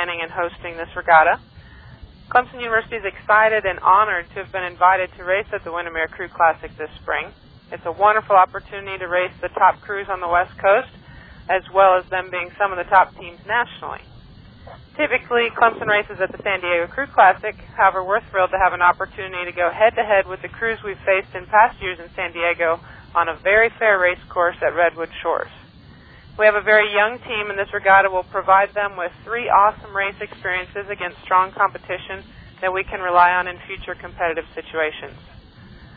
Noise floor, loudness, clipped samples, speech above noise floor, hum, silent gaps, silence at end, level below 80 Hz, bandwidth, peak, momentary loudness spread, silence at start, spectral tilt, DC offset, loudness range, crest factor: -45 dBFS; -19 LUFS; under 0.1%; 26 dB; none; none; 0.1 s; -48 dBFS; 4.9 kHz; 0 dBFS; 14 LU; 0 s; -7.5 dB/octave; under 0.1%; 4 LU; 20 dB